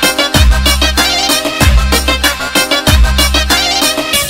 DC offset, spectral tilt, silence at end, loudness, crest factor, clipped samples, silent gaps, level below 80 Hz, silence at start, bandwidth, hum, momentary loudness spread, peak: 1%; -3 dB/octave; 0 s; -9 LUFS; 10 dB; under 0.1%; none; -14 dBFS; 0 s; 16.5 kHz; none; 2 LU; 0 dBFS